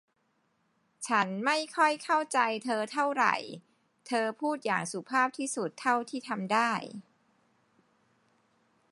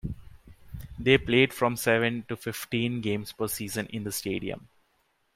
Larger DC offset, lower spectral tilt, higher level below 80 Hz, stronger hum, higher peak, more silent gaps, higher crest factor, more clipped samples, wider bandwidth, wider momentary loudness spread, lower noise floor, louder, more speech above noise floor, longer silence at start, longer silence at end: neither; about the same, -3.5 dB/octave vs -4.5 dB/octave; second, -86 dBFS vs -52 dBFS; neither; second, -10 dBFS vs -6 dBFS; neither; about the same, 22 dB vs 22 dB; neither; second, 11.5 kHz vs 16 kHz; second, 9 LU vs 19 LU; about the same, -74 dBFS vs -71 dBFS; second, -30 LUFS vs -27 LUFS; about the same, 45 dB vs 44 dB; first, 1 s vs 0.05 s; first, 1.9 s vs 0.75 s